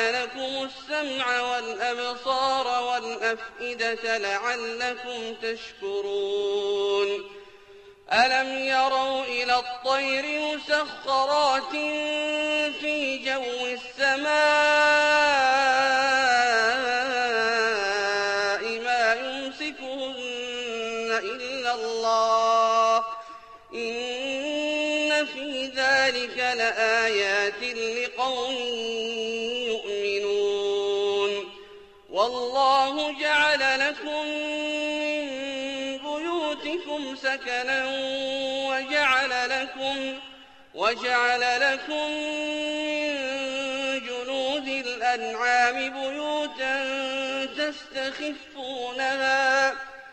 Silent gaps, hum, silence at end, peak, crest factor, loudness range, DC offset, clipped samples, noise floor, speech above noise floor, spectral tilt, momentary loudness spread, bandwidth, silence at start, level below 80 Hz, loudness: none; none; 0 s; -10 dBFS; 16 dB; 6 LU; under 0.1%; under 0.1%; -50 dBFS; 24 dB; -1.5 dB/octave; 10 LU; 8.8 kHz; 0 s; -64 dBFS; -25 LUFS